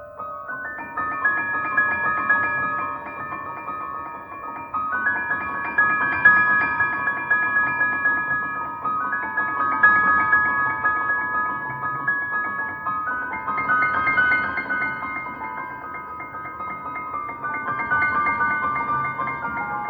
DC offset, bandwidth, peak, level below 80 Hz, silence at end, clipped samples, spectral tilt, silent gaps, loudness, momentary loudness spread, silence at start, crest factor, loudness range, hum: under 0.1%; over 20 kHz; -4 dBFS; -56 dBFS; 0 s; under 0.1%; -7 dB/octave; none; -21 LUFS; 14 LU; 0 s; 20 dB; 7 LU; none